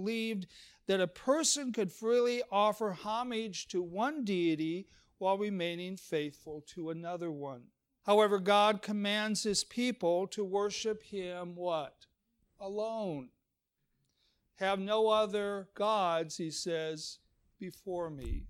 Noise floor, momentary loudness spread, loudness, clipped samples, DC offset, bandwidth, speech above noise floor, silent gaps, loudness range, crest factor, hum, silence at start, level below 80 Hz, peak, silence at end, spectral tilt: -84 dBFS; 14 LU; -33 LUFS; under 0.1%; under 0.1%; 16.5 kHz; 50 dB; none; 7 LU; 20 dB; none; 0 s; -56 dBFS; -14 dBFS; 0 s; -3.5 dB/octave